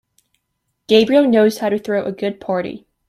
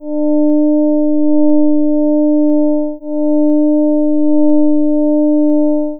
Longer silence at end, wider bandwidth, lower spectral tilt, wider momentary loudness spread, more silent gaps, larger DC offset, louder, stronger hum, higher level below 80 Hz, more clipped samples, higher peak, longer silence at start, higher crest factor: first, 0.3 s vs 0 s; first, 15.5 kHz vs 1 kHz; second, -5.5 dB/octave vs -14 dB/octave; first, 11 LU vs 3 LU; neither; neither; second, -16 LUFS vs -12 LUFS; neither; about the same, -58 dBFS vs -60 dBFS; neither; about the same, -2 dBFS vs -2 dBFS; first, 0.9 s vs 0 s; first, 16 dB vs 10 dB